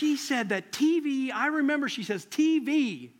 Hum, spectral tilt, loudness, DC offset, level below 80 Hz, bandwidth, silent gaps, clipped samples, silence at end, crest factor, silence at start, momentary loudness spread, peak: none; -4 dB/octave; -27 LUFS; under 0.1%; -80 dBFS; 16.5 kHz; none; under 0.1%; 0.1 s; 14 dB; 0 s; 5 LU; -12 dBFS